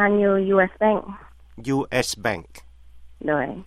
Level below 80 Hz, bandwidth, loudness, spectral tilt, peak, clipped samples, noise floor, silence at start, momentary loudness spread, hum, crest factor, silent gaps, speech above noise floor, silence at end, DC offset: -50 dBFS; 15 kHz; -22 LUFS; -5 dB/octave; -4 dBFS; under 0.1%; -44 dBFS; 0 s; 15 LU; none; 18 dB; none; 22 dB; 0 s; under 0.1%